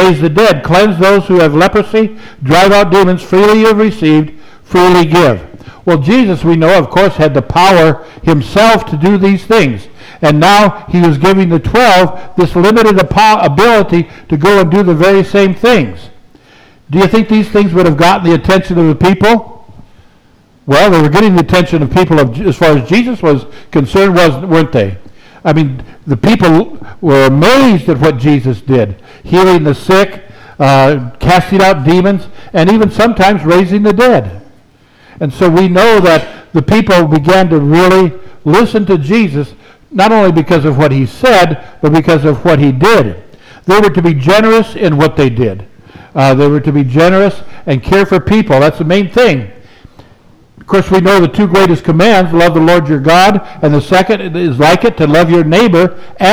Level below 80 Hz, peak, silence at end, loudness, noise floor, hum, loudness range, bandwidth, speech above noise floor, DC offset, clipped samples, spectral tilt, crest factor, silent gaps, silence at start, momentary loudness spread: -34 dBFS; 0 dBFS; 0 s; -8 LUFS; -45 dBFS; none; 2 LU; over 20 kHz; 37 dB; under 0.1%; under 0.1%; -6.5 dB/octave; 8 dB; none; 0 s; 7 LU